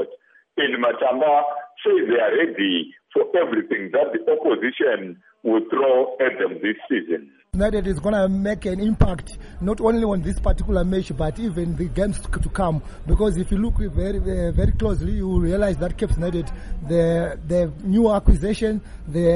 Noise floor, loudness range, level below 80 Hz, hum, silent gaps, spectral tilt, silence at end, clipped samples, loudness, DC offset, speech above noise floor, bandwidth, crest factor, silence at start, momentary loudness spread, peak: -46 dBFS; 3 LU; -28 dBFS; none; none; -7 dB/octave; 0 s; under 0.1%; -22 LUFS; under 0.1%; 25 dB; 11.5 kHz; 16 dB; 0 s; 9 LU; -4 dBFS